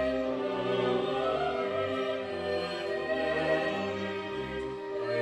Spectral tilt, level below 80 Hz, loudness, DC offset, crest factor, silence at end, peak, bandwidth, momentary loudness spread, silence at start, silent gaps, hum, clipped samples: -6 dB/octave; -58 dBFS; -31 LUFS; under 0.1%; 14 dB; 0 s; -16 dBFS; 9.6 kHz; 6 LU; 0 s; none; none; under 0.1%